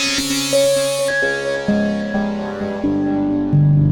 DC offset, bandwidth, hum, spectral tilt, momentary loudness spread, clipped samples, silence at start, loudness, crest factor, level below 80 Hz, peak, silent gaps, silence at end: under 0.1%; 19 kHz; none; -5 dB/octave; 7 LU; under 0.1%; 0 s; -18 LUFS; 12 dB; -42 dBFS; -6 dBFS; none; 0 s